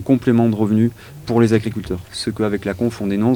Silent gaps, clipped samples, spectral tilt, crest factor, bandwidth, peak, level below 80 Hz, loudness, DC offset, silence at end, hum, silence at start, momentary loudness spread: none; under 0.1%; -7 dB/octave; 16 dB; 19.5 kHz; -2 dBFS; -44 dBFS; -19 LUFS; under 0.1%; 0 s; none; 0 s; 10 LU